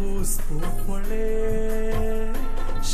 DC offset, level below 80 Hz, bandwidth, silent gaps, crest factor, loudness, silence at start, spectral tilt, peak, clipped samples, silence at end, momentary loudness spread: under 0.1%; -22 dBFS; 14 kHz; none; 8 dB; -29 LUFS; 0 s; -5 dB/octave; -12 dBFS; under 0.1%; 0 s; 5 LU